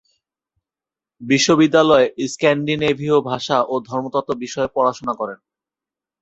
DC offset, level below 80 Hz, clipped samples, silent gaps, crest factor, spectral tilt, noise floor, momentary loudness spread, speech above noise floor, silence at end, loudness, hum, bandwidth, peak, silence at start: under 0.1%; -58 dBFS; under 0.1%; none; 18 dB; -4.5 dB/octave; -89 dBFS; 12 LU; 72 dB; 0.85 s; -18 LUFS; none; 8.2 kHz; -2 dBFS; 1.2 s